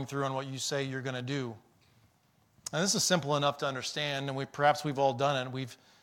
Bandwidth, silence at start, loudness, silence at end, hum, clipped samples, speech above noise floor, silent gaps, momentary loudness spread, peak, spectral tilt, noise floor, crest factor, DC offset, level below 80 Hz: 17 kHz; 0 s; -31 LUFS; 0.25 s; none; under 0.1%; 37 dB; none; 10 LU; -12 dBFS; -3.5 dB/octave; -69 dBFS; 22 dB; under 0.1%; -72 dBFS